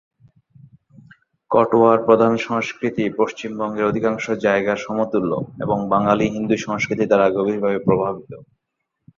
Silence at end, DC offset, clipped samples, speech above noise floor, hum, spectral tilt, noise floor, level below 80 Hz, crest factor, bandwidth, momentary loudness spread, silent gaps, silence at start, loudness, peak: 0.75 s; under 0.1%; under 0.1%; 59 dB; none; -6.5 dB/octave; -77 dBFS; -56 dBFS; 18 dB; 7.4 kHz; 9 LU; none; 1.5 s; -19 LUFS; -2 dBFS